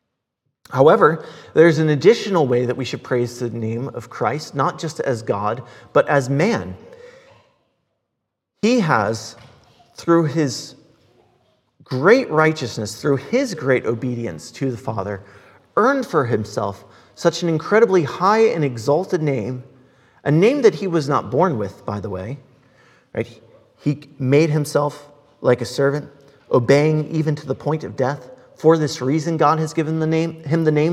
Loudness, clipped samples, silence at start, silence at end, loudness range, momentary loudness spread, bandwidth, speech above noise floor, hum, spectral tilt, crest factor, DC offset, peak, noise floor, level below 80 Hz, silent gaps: -19 LUFS; under 0.1%; 0.7 s; 0 s; 5 LU; 14 LU; 14 kHz; 60 dB; none; -6.5 dB/octave; 20 dB; under 0.1%; 0 dBFS; -78 dBFS; -64 dBFS; none